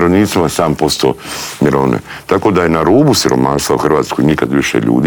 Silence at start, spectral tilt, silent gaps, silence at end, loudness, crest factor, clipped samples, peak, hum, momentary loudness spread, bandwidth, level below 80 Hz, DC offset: 0 s; -5 dB/octave; none; 0 s; -12 LUFS; 10 dB; under 0.1%; 0 dBFS; none; 6 LU; over 20 kHz; -38 dBFS; under 0.1%